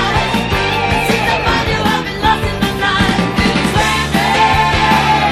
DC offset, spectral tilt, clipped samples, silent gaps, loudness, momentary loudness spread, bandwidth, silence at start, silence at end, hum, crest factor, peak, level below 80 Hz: under 0.1%; -4.5 dB/octave; under 0.1%; none; -13 LUFS; 4 LU; 15.5 kHz; 0 s; 0 s; none; 12 dB; 0 dBFS; -26 dBFS